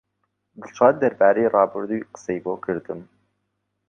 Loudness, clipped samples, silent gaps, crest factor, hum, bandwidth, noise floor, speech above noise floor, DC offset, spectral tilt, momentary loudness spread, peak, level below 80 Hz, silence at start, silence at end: -21 LUFS; under 0.1%; none; 20 dB; none; 7.2 kHz; -76 dBFS; 55 dB; under 0.1%; -7 dB/octave; 15 LU; -2 dBFS; -66 dBFS; 0.6 s; 0.85 s